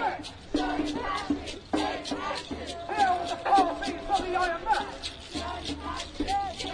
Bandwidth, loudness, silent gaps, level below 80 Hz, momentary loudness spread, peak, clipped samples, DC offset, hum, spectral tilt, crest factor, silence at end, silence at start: 10.5 kHz; -30 LUFS; none; -46 dBFS; 11 LU; -12 dBFS; under 0.1%; under 0.1%; none; -4 dB/octave; 18 dB; 0 s; 0 s